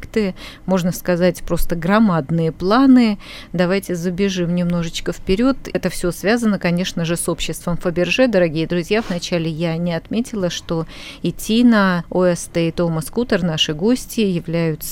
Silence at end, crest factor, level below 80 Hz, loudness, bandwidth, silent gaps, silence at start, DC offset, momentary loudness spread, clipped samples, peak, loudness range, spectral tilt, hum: 0 s; 16 dB; -34 dBFS; -18 LUFS; 17 kHz; none; 0 s; under 0.1%; 8 LU; under 0.1%; -2 dBFS; 3 LU; -5.5 dB/octave; none